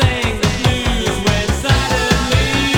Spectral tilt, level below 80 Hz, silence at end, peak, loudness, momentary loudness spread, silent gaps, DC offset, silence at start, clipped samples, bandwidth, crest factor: -4.5 dB/octave; -24 dBFS; 0 s; 0 dBFS; -16 LUFS; 3 LU; none; under 0.1%; 0 s; under 0.1%; 19 kHz; 16 dB